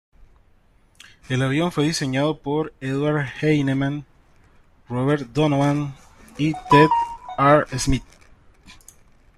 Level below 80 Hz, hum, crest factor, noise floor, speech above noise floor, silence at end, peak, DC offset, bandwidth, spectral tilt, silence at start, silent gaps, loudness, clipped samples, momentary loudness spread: -42 dBFS; none; 20 dB; -56 dBFS; 36 dB; 0.65 s; -2 dBFS; under 0.1%; 12.5 kHz; -6 dB/octave; 1.3 s; none; -21 LUFS; under 0.1%; 11 LU